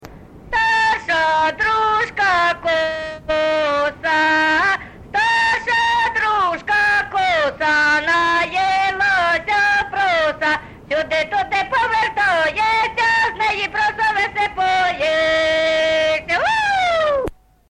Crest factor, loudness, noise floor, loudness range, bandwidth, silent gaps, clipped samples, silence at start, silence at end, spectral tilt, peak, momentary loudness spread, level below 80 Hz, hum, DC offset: 10 dB; -17 LUFS; -39 dBFS; 2 LU; 11.5 kHz; none; under 0.1%; 0 s; 0.4 s; -3 dB/octave; -8 dBFS; 4 LU; -46 dBFS; none; under 0.1%